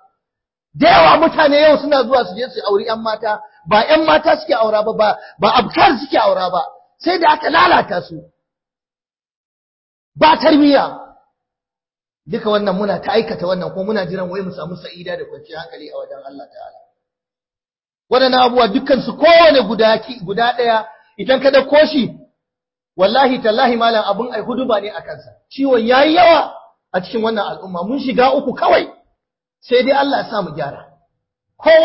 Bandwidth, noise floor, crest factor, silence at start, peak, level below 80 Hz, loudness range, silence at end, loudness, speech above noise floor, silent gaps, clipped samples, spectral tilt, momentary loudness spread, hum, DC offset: 5.8 kHz; under -90 dBFS; 16 dB; 0.75 s; 0 dBFS; -50 dBFS; 8 LU; 0 s; -14 LUFS; over 76 dB; 9.36-10.12 s; under 0.1%; -8.5 dB/octave; 17 LU; none; under 0.1%